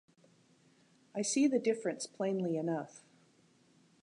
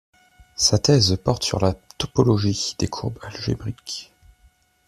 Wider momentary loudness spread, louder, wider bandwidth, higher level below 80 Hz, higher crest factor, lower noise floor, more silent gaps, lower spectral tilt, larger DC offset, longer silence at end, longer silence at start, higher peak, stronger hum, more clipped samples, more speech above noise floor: second, 10 LU vs 14 LU; second, -34 LUFS vs -21 LUFS; second, 11 kHz vs 14 kHz; second, -88 dBFS vs -46 dBFS; about the same, 18 dB vs 20 dB; first, -68 dBFS vs -58 dBFS; neither; about the same, -4.5 dB/octave vs -4.5 dB/octave; neither; first, 1.05 s vs 0.85 s; first, 1.15 s vs 0.6 s; second, -20 dBFS vs -4 dBFS; neither; neither; about the same, 34 dB vs 37 dB